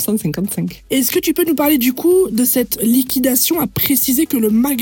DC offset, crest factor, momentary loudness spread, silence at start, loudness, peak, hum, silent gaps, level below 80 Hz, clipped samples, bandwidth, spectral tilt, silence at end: under 0.1%; 14 dB; 6 LU; 0 s; -15 LUFS; 0 dBFS; none; none; -46 dBFS; under 0.1%; 19 kHz; -4 dB/octave; 0 s